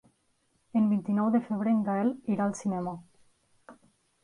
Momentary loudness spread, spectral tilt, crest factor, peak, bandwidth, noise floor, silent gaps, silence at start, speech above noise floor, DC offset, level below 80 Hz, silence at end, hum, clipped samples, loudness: 7 LU; -8 dB/octave; 14 dB; -16 dBFS; 10.5 kHz; -72 dBFS; none; 0.75 s; 44 dB; under 0.1%; -74 dBFS; 0.5 s; none; under 0.1%; -29 LUFS